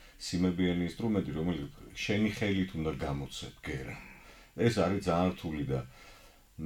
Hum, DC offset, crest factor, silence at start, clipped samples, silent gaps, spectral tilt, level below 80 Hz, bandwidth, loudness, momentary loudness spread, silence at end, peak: none; under 0.1%; 18 dB; 0 s; under 0.1%; none; -6 dB/octave; -52 dBFS; 16.5 kHz; -33 LUFS; 14 LU; 0 s; -14 dBFS